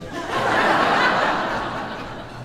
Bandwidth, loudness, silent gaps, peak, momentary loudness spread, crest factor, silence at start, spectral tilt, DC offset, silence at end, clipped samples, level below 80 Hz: 16 kHz; -20 LUFS; none; -4 dBFS; 13 LU; 16 dB; 0 s; -4 dB/octave; under 0.1%; 0 s; under 0.1%; -46 dBFS